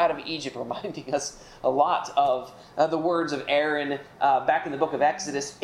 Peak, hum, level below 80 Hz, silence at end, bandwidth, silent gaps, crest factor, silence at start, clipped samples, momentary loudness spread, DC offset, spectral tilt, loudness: -8 dBFS; none; -62 dBFS; 0 s; 12.5 kHz; none; 18 dB; 0 s; under 0.1%; 9 LU; under 0.1%; -3.5 dB/octave; -26 LUFS